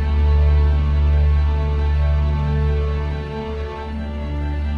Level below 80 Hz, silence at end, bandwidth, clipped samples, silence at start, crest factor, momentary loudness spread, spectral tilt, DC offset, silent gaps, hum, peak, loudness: -18 dBFS; 0 s; 4.9 kHz; under 0.1%; 0 s; 10 dB; 11 LU; -9 dB/octave; under 0.1%; none; none; -6 dBFS; -20 LUFS